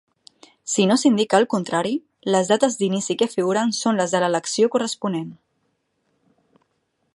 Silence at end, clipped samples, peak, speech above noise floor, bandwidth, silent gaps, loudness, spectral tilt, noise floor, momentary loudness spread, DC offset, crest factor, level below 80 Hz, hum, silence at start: 1.8 s; under 0.1%; -2 dBFS; 51 dB; 11.5 kHz; none; -21 LUFS; -4 dB/octave; -71 dBFS; 9 LU; under 0.1%; 20 dB; -72 dBFS; none; 0.65 s